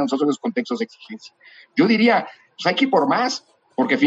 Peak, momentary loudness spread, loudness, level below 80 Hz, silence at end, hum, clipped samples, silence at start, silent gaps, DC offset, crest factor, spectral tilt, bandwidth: -4 dBFS; 18 LU; -20 LUFS; -76 dBFS; 0 s; none; under 0.1%; 0 s; none; under 0.1%; 16 dB; -5 dB/octave; 8 kHz